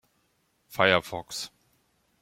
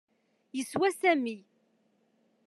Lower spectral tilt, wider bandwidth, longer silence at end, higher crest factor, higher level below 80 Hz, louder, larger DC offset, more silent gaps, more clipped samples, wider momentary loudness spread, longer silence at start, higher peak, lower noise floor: about the same, -3.5 dB/octave vs -4 dB/octave; first, 16.5 kHz vs 13 kHz; second, 0.75 s vs 1.05 s; first, 26 dB vs 20 dB; first, -66 dBFS vs -84 dBFS; first, -26 LUFS vs -29 LUFS; neither; neither; neither; first, 18 LU vs 14 LU; first, 0.7 s vs 0.55 s; first, -6 dBFS vs -14 dBFS; about the same, -71 dBFS vs -71 dBFS